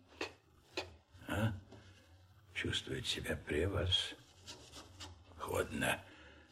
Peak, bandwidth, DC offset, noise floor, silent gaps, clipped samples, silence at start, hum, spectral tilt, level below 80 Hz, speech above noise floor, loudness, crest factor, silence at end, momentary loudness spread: -22 dBFS; 16 kHz; under 0.1%; -63 dBFS; none; under 0.1%; 0.1 s; none; -4 dB/octave; -58 dBFS; 25 dB; -39 LUFS; 20 dB; 0.05 s; 19 LU